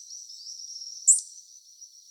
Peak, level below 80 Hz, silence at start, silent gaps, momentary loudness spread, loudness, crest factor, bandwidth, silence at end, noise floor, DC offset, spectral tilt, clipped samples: -6 dBFS; under -90 dBFS; 0 s; none; 20 LU; -21 LUFS; 24 dB; over 20 kHz; 0.25 s; -51 dBFS; under 0.1%; 11 dB/octave; under 0.1%